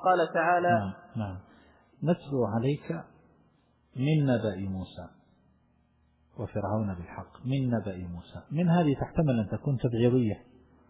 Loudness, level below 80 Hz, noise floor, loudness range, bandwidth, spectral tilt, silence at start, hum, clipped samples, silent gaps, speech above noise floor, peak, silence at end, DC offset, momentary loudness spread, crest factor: -29 LUFS; -54 dBFS; -67 dBFS; 6 LU; 4 kHz; -11.5 dB/octave; 0 s; none; under 0.1%; none; 39 dB; -12 dBFS; 0.5 s; under 0.1%; 16 LU; 18 dB